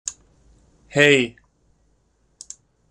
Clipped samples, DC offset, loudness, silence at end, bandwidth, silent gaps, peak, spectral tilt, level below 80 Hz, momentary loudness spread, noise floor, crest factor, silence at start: under 0.1%; under 0.1%; -18 LUFS; 1.6 s; 13 kHz; none; -2 dBFS; -3.5 dB/octave; -58 dBFS; 25 LU; -64 dBFS; 22 dB; 0.05 s